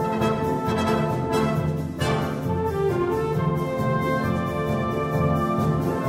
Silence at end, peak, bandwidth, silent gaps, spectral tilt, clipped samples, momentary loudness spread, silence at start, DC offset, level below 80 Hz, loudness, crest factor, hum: 0 s; -10 dBFS; 16 kHz; none; -7 dB/octave; under 0.1%; 3 LU; 0 s; under 0.1%; -42 dBFS; -24 LUFS; 14 dB; none